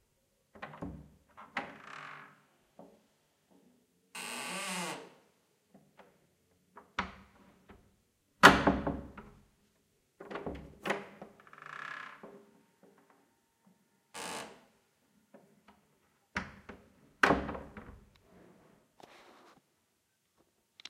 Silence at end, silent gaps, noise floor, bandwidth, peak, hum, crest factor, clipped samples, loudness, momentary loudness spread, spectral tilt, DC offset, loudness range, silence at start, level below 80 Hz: 0 s; none; -78 dBFS; 16 kHz; -4 dBFS; none; 34 dB; under 0.1%; -32 LUFS; 25 LU; -3.5 dB/octave; under 0.1%; 20 LU; 0.55 s; -58 dBFS